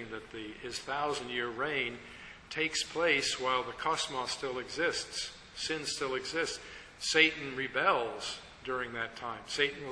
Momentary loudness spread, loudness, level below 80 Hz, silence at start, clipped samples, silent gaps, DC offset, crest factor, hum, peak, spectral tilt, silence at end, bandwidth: 14 LU; -33 LUFS; -62 dBFS; 0 s; under 0.1%; none; under 0.1%; 26 dB; none; -8 dBFS; -2 dB/octave; 0 s; 11 kHz